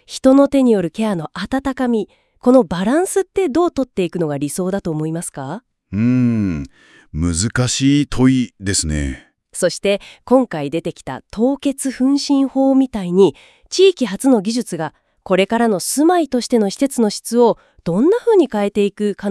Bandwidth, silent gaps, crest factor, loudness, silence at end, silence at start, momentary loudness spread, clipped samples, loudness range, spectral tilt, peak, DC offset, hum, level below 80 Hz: 12 kHz; none; 16 dB; -17 LUFS; 0 s; 0.1 s; 11 LU; under 0.1%; 4 LU; -5.5 dB/octave; 0 dBFS; under 0.1%; none; -40 dBFS